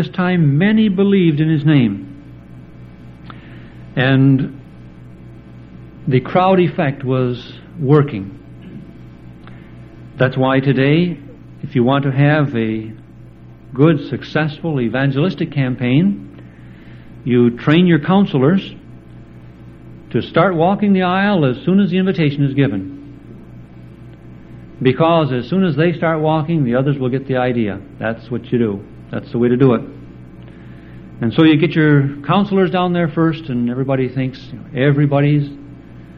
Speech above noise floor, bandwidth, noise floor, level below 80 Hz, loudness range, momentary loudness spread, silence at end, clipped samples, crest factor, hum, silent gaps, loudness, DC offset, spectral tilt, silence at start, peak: 24 dB; 5.4 kHz; -38 dBFS; -46 dBFS; 4 LU; 20 LU; 0 s; under 0.1%; 16 dB; none; none; -15 LUFS; under 0.1%; -10 dB/octave; 0 s; 0 dBFS